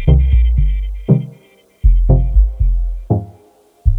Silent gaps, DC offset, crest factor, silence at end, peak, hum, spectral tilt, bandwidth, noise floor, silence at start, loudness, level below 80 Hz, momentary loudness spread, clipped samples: none; under 0.1%; 14 dB; 0 s; 0 dBFS; none; -11 dB/octave; 3.4 kHz; -49 dBFS; 0 s; -16 LUFS; -14 dBFS; 9 LU; under 0.1%